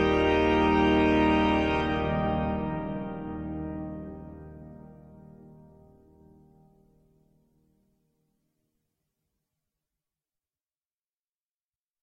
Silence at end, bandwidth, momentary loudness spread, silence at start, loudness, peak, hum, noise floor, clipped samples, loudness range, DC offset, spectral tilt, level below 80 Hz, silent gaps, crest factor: 6.5 s; 8 kHz; 22 LU; 0 s; -26 LUFS; -12 dBFS; none; under -90 dBFS; under 0.1%; 23 LU; under 0.1%; -7.5 dB/octave; -44 dBFS; none; 18 dB